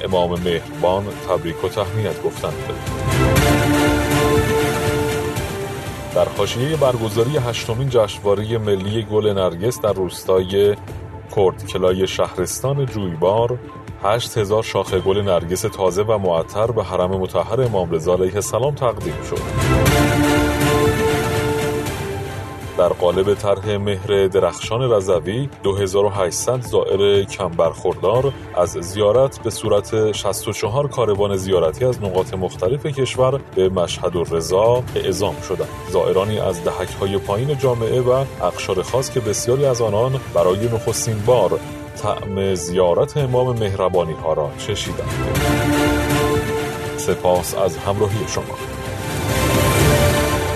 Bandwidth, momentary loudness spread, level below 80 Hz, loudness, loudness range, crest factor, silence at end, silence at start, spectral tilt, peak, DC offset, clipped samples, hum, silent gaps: 14 kHz; 8 LU; -36 dBFS; -19 LUFS; 2 LU; 16 dB; 0 s; 0 s; -5.5 dB/octave; -2 dBFS; under 0.1%; under 0.1%; none; none